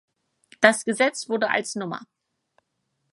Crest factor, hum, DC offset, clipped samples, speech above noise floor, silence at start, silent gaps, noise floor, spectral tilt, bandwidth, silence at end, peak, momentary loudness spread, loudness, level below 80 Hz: 26 dB; none; under 0.1%; under 0.1%; 53 dB; 0.6 s; none; -76 dBFS; -3 dB/octave; 11.5 kHz; 1.1 s; 0 dBFS; 13 LU; -23 LUFS; -74 dBFS